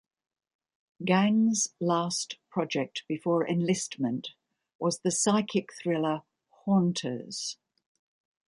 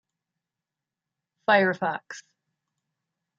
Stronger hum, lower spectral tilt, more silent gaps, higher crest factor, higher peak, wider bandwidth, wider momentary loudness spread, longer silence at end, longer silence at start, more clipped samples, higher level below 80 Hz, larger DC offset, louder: neither; about the same, -4.5 dB/octave vs -5 dB/octave; first, 4.75-4.79 s vs none; about the same, 20 dB vs 24 dB; second, -10 dBFS vs -6 dBFS; first, 11.5 kHz vs 7.8 kHz; second, 11 LU vs 22 LU; second, 0.95 s vs 1.2 s; second, 1 s vs 1.5 s; neither; first, -74 dBFS vs -82 dBFS; neither; second, -29 LUFS vs -24 LUFS